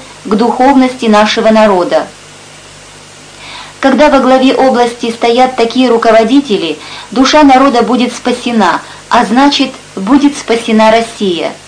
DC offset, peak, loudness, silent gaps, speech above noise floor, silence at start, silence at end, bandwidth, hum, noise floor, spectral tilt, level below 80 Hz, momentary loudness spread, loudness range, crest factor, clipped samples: under 0.1%; 0 dBFS; -8 LUFS; none; 25 dB; 0 s; 0.1 s; 10.5 kHz; 50 Hz at -45 dBFS; -33 dBFS; -4.5 dB/octave; -40 dBFS; 9 LU; 3 LU; 8 dB; 0.4%